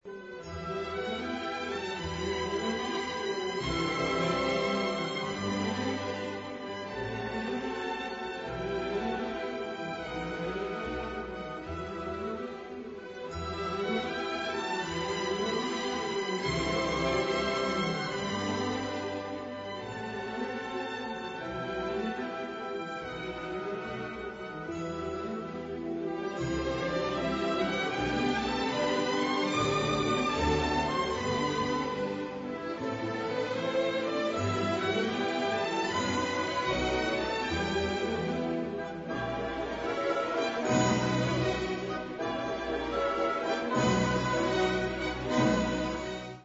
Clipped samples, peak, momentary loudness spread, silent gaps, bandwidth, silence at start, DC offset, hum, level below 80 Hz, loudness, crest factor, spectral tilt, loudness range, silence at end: under 0.1%; -14 dBFS; 9 LU; none; 8 kHz; 0.05 s; under 0.1%; none; -52 dBFS; -32 LUFS; 18 dB; -5 dB/octave; 7 LU; 0 s